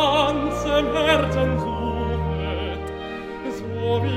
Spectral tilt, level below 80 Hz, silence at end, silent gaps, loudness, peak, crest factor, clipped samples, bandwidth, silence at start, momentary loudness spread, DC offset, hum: -6 dB/octave; -34 dBFS; 0 s; none; -23 LUFS; -6 dBFS; 16 dB; under 0.1%; 15.5 kHz; 0 s; 12 LU; 0.2%; none